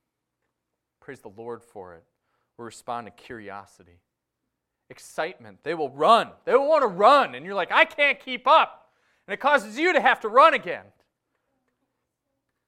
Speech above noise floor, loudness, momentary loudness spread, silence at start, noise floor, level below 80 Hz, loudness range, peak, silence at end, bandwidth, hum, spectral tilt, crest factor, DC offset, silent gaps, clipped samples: 59 dB; -21 LUFS; 22 LU; 1.1 s; -82 dBFS; -72 dBFS; 20 LU; -2 dBFS; 1.9 s; 14 kHz; none; -3.5 dB/octave; 22 dB; under 0.1%; none; under 0.1%